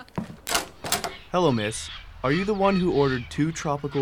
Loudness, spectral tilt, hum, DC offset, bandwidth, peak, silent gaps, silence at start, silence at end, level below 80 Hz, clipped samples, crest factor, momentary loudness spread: -25 LUFS; -4.5 dB/octave; none; 0.1%; 18 kHz; -4 dBFS; none; 0 s; 0 s; -46 dBFS; under 0.1%; 22 dB; 10 LU